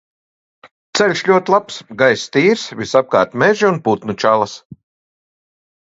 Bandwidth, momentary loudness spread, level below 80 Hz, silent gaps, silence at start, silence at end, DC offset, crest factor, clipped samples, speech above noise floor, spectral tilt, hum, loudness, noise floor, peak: 8 kHz; 7 LU; -58 dBFS; 0.71-0.93 s, 4.65-4.70 s; 0.65 s; 1.1 s; under 0.1%; 16 dB; under 0.1%; over 75 dB; -4.5 dB/octave; none; -15 LUFS; under -90 dBFS; 0 dBFS